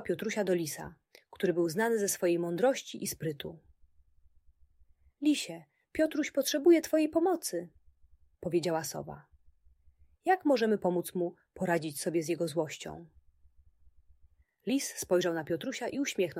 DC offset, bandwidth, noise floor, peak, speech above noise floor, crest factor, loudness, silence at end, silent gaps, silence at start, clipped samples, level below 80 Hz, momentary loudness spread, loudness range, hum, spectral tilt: under 0.1%; 16 kHz; -65 dBFS; -14 dBFS; 34 dB; 18 dB; -31 LUFS; 0 s; none; 0 s; under 0.1%; -68 dBFS; 15 LU; 6 LU; none; -4.5 dB/octave